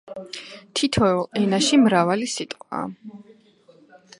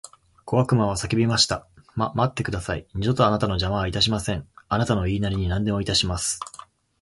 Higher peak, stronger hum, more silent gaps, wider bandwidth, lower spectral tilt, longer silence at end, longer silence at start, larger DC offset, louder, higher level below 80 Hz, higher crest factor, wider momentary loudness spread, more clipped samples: about the same, -4 dBFS vs -4 dBFS; neither; neither; about the same, 11.5 kHz vs 11.5 kHz; about the same, -4.5 dB/octave vs -4.5 dB/octave; first, 1 s vs 0.5 s; about the same, 0.05 s vs 0.05 s; neither; about the same, -21 LUFS vs -23 LUFS; second, -52 dBFS vs -40 dBFS; about the same, 20 dB vs 20 dB; first, 19 LU vs 9 LU; neither